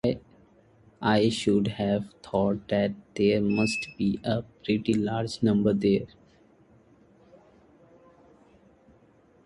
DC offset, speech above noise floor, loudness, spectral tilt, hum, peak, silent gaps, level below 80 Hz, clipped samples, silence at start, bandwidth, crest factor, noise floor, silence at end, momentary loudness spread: under 0.1%; 34 dB; -26 LUFS; -6.5 dB/octave; none; -10 dBFS; none; -56 dBFS; under 0.1%; 0.05 s; 11.5 kHz; 18 dB; -59 dBFS; 3.4 s; 7 LU